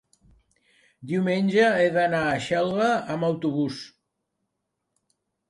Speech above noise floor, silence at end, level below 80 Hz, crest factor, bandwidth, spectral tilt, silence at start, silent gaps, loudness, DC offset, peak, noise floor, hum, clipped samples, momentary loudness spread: 57 dB; 1.65 s; -64 dBFS; 18 dB; 11.5 kHz; -6 dB/octave; 1 s; none; -23 LUFS; under 0.1%; -8 dBFS; -80 dBFS; none; under 0.1%; 10 LU